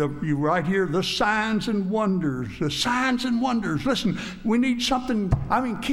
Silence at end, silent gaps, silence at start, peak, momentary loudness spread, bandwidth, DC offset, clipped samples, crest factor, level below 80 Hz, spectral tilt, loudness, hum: 0 s; none; 0 s; -8 dBFS; 4 LU; 14 kHz; under 0.1%; under 0.1%; 16 dB; -42 dBFS; -5 dB/octave; -24 LUFS; none